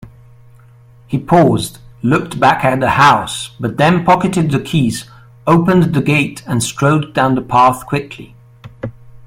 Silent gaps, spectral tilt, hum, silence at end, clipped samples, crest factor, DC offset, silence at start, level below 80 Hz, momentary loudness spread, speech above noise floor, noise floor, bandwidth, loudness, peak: none; -6 dB/octave; none; 0.1 s; under 0.1%; 14 dB; under 0.1%; 0 s; -44 dBFS; 13 LU; 30 dB; -43 dBFS; 16 kHz; -13 LUFS; 0 dBFS